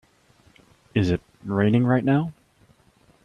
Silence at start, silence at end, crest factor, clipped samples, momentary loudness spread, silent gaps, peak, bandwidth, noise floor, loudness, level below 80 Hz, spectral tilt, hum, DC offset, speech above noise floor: 0.95 s; 0.95 s; 20 dB; under 0.1%; 9 LU; none; -6 dBFS; 9.8 kHz; -59 dBFS; -23 LUFS; -54 dBFS; -8.5 dB/octave; none; under 0.1%; 38 dB